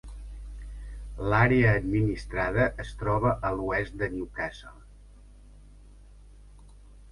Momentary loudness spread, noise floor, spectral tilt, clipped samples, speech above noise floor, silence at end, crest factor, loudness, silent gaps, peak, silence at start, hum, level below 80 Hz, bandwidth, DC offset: 22 LU; -51 dBFS; -8 dB/octave; under 0.1%; 24 dB; 0 s; 20 dB; -27 LUFS; none; -8 dBFS; 0.05 s; 50 Hz at -40 dBFS; -42 dBFS; 11 kHz; under 0.1%